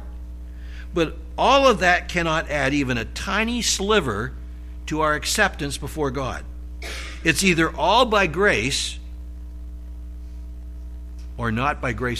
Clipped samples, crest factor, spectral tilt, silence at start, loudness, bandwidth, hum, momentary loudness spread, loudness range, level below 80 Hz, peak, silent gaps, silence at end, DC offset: under 0.1%; 20 dB; -3.5 dB/octave; 0 s; -21 LUFS; 15 kHz; 60 Hz at -35 dBFS; 20 LU; 5 LU; -34 dBFS; -4 dBFS; none; 0 s; under 0.1%